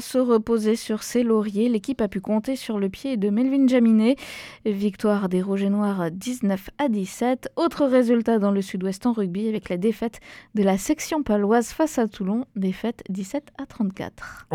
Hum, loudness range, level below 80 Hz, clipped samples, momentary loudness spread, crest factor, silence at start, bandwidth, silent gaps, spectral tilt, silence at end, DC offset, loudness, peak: none; 3 LU; -54 dBFS; under 0.1%; 10 LU; 16 dB; 0 s; 16 kHz; none; -6 dB/octave; 0 s; under 0.1%; -23 LUFS; -6 dBFS